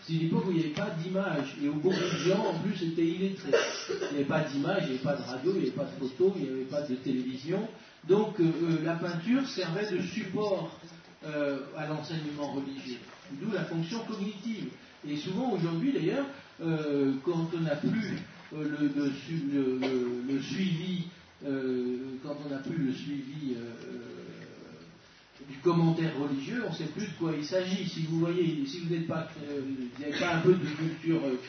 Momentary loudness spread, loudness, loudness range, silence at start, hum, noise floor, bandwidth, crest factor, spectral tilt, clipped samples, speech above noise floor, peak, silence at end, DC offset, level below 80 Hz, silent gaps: 11 LU; -32 LUFS; 6 LU; 0 s; none; -56 dBFS; 6.6 kHz; 20 dB; -6.5 dB/octave; under 0.1%; 25 dB; -12 dBFS; 0 s; under 0.1%; -72 dBFS; none